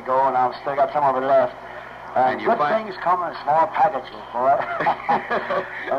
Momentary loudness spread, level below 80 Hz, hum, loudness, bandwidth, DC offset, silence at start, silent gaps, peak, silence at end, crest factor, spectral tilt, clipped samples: 8 LU; -58 dBFS; none; -21 LUFS; 7 kHz; under 0.1%; 0 s; none; -8 dBFS; 0 s; 14 dB; -6.5 dB/octave; under 0.1%